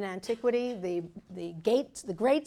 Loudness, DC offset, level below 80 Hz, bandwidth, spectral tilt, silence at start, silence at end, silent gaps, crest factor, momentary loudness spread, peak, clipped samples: -31 LUFS; under 0.1%; -66 dBFS; 13 kHz; -5.5 dB/octave; 0 s; 0 s; none; 16 dB; 12 LU; -14 dBFS; under 0.1%